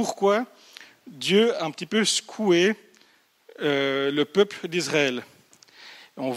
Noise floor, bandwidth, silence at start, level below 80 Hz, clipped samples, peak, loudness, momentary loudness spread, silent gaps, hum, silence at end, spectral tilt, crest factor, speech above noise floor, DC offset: -61 dBFS; 15.5 kHz; 0 s; -76 dBFS; under 0.1%; -6 dBFS; -23 LUFS; 15 LU; none; none; 0 s; -3.5 dB/octave; 18 dB; 37 dB; under 0.1%